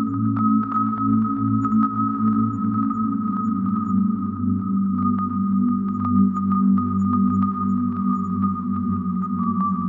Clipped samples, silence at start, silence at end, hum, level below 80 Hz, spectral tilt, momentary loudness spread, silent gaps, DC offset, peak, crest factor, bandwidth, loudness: under 0.1%; 0 s; 0 s; none; -56 dBFS; -11.5 dB/octave; 4 LU; none; under 0.1%; -8 dBFS; 12 dB; 2.3 kHz; -21 LUFS